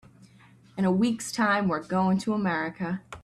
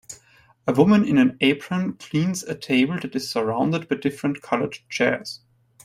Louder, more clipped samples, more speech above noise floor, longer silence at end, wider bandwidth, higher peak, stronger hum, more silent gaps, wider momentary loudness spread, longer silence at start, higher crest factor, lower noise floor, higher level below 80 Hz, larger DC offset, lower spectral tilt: second, -26 LUFS vs -22 LUFS; neither; second, 29 dB vs 35 dB; second, 0.05 s vs 0.5 s; second, 12.5 kHz vs 15 kHz; second, -12 dBFS vs -2 dBFS; neither; neither; second, 8 LU vs 12 LU; first, 0.75 s vs 0.1 s; second, 14 dB vs 20 dB; about the same, -55 dBFS vs -56 dBFS; about the same, -62 dBFS vs -60 dBFS; neither; about the same, -6 dB/octave vs -5.5 dB/octave